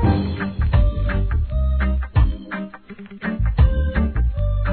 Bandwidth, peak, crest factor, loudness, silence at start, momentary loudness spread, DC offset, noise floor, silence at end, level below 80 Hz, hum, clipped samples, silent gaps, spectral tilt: 4.5 kHz; -4 dBFS; 16 dB; -21 LUFS; 0 s; 12 LU; 0.3%; -38 dBFS; 0 s; -20 dBFS; none; under 0.1%; none; -11.5 dB/octave